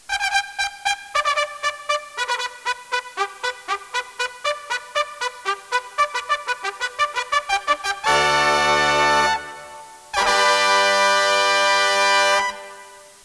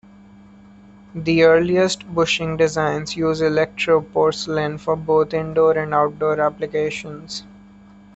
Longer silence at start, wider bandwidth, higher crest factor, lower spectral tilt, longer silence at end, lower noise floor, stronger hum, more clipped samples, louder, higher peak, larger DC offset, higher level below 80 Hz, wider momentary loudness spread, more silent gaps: second, 0.1 s vs 1.15 s; first, 11 kHz vs 8.2 kHz; about the same, 18 dB vs 16 dB; second, -0.5 dB/octave vs -5 dB/octave; second, 0.2 s vs 0.7 s; about the same, -43 dBFS vs -45 dBFS; neither; neither; about the same, -20 LUFS vs -19 LUFS; about the same, -2 dBFS vs -4 dBFS; neither; about the same, -54 dBFS vs -50 dBFS; about the same, 11 LU vs 11 LU; neither